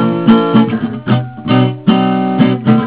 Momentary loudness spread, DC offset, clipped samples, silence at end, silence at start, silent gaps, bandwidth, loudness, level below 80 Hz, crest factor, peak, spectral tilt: 6 LU; 0.4%; 0.4%; 0 s; 0 s; none; 4 kHz; -12 LUFS; -48 dBFS; 12 dB; 0 dBFS; -11.5 dB/octave